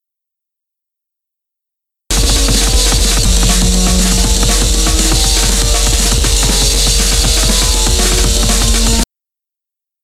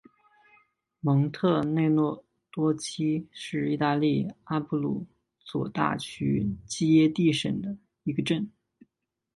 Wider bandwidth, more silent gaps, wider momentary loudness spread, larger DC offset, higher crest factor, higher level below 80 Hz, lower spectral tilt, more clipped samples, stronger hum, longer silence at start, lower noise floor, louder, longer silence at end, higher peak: first, 16 kHz vs 11.5 kHz; neither; second, 1 LU vs 12 LU; neither; second, 12 dB vs 20 dB; first, -14 dBFS vs -60 dBFS; second, -2.5 dB/octave vs -6.5 dB/octave; neither; neither; first, 2.1 s vs 1.05 s; about the same, -84 dBFS vs -83 dBFS; first, -11 LUFS vs -27 LUFS; first, 1 s vs 0.85 s; first, 0 dBFS vs -8 dBFS